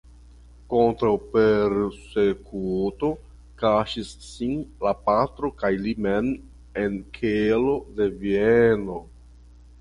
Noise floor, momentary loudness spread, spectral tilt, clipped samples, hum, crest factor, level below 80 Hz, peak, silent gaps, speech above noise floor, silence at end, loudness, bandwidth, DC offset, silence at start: -48 dBFS; 10 LU; -7 dB/octave; under 0.1%; none; 18 dB; -46 dBFS; -6 dBFS; none; 25 dB; 0.75 s; -24 LUFS; 11 kHz; under 0.1%; 0.7 s